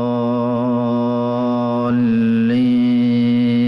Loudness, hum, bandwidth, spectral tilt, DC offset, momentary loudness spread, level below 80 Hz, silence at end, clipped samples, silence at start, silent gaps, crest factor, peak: -17 LUFS; none; 5.6 kHz; -9.5 dB/octave; under 0.1%; 4 LU; -56 dBFS; 0 s; under 0.1%; 0 s; none; 6 dB; -10 dBFS